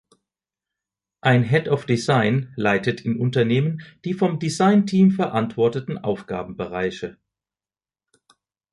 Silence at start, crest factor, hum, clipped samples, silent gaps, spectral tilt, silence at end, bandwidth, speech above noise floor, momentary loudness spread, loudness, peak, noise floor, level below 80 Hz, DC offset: 1.25 s; 18 dB; none; under 0.1%; none; -7 dB/octave; 1.6 s; 11.5 kHz; over 70 dB; 11 LU; -21 LUFS; -4 dBFS; under -90 dBFS; -58 dBFS; under 0.1%